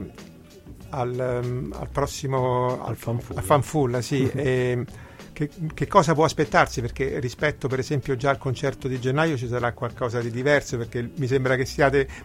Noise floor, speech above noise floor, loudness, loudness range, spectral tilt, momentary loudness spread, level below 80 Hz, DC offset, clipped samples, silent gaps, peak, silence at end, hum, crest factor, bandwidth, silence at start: -45 dBFS; 21 dB; -24 LUFS; 3 LU; -6 dB/octave; 9 LU; -44 dBFS; under 0.1%; under 0.1%; none; -2 dBFS; 0 s; none; 22 dB; 16 kHz; 0 s